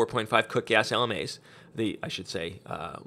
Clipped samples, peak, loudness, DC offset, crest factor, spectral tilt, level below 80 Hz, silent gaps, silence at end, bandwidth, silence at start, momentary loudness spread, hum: under 0.1%; -4 dBFS; -28 LUFS; under 0.1%; 24 dB; -4 dB/octave; -62 dBFS; none; 0.05 s; 15.5 kHz; 0 s; 13 LU; none